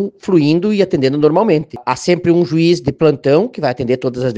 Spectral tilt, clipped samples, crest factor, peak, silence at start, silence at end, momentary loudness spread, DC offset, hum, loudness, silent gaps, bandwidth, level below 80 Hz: -7 dB/octave; under 0.1%; 14 dB; 0 dBFS; 0 s; 0 s; 5 LU; under 0.1%; none; -14 LUFS; none; 9.2 kHz; -50 dBFS